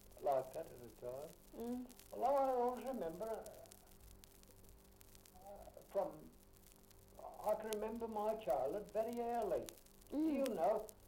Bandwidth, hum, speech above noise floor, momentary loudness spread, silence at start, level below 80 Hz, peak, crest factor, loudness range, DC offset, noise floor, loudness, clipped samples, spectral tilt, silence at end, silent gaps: 16.5 kHz; none; 23 dB; 24 LU; 0.05 s; -68 dBFS; -22 dBFS; 20 dB; 10 LU; under 0.1%; -64 dBFS; -42 LUFS; under 0.1%; -5.5 dB/octave; 0 s; none